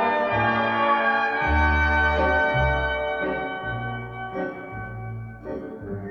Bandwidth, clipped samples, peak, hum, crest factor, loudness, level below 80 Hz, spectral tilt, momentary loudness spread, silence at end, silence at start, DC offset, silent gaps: 6.4 kHz; under 0.1%; -8 dBFS; none; 16 dB; -23 LUFS; -34 dBFS; -7 dB/octave; 15 LU; 0 s; 0 s; under 0.1%; none